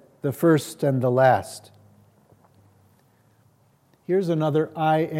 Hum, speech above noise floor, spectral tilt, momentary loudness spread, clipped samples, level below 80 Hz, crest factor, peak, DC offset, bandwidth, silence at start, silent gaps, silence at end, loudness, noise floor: none; 40 dB; -7 dB/octave; 15 LU; under 0.1%; -72 dBFS; 18 dB; -6 dBFS; under 0.1%; 16.5 kHz; 0.25 s; none; 0 s; -22 LUFS; -61 dBFS